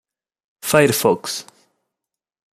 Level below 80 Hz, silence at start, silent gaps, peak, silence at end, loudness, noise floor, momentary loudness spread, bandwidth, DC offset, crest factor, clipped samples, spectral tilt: -60 dBFS; 0.65 s; none; -2 dBFS; 1.1 s; -17 LUFS; -84 dBFS; 15 LU; 16 kHz; under 0.1%; 20 dB; under 0.1%; -4 dB/octave